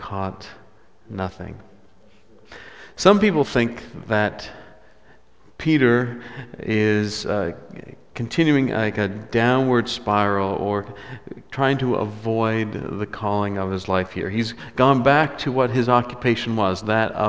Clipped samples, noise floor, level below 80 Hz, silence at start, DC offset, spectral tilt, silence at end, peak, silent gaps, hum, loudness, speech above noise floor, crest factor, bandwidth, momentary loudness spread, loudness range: under 0.1%; -55 dBFS; -48 dBFS; 0 s; 0.4%; -6.5 dB/octave; 0 s; 0 dBFS; none; none; -21 LUFS; 34 dB; 22 dB; 8 kHz; 20 LU; 4 LU